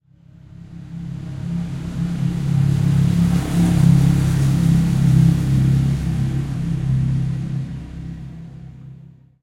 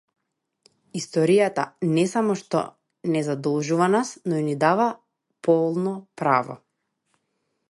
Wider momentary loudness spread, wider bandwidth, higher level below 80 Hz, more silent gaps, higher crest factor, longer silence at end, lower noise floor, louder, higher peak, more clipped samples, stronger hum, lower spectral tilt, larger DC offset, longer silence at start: first, 20 LU vs 13 LU; first, 13 kHz vs 11.5 kHz; first, -32 dBFS vs -72 dBFS; neither; about the same, 16 dB vs 20 dB; second, 0.35 s vs 1.15 s; second, -46 dBFS vs -76 dBFS; first, -18 LUFS vs -23 LUFS; about the same, -2 dBFS vs -4 dBFS; neither; neither; first, -8 dB/octave vs -6 dB/octave; neither; second, 0.6 s vs 0.95 s